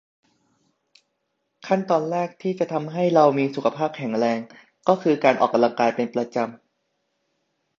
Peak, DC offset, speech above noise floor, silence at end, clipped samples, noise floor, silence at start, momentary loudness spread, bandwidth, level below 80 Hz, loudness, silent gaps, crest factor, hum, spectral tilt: -2 dBFS; under 0.1%; 54 dB; 1.25 s; under 0.1%; -75 dBFS; 1.65 s; 9 LU; 7.4 kHz; -72 dBFS; -22 LUFS; none; 22 dB; none; -6.5 dB/octave